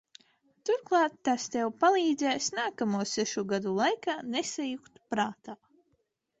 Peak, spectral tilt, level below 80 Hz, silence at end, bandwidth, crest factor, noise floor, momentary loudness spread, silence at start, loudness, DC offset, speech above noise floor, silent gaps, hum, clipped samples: -12 dBFS; -3.5 dB/octave; -74 dBFS; 0.85 s; 8.4 kHz; 18 dB; -76 dBFS; 11 LU; 0.65 s; -30 LUFS; under 0.1%; 46 dB; none; none; under 0.1%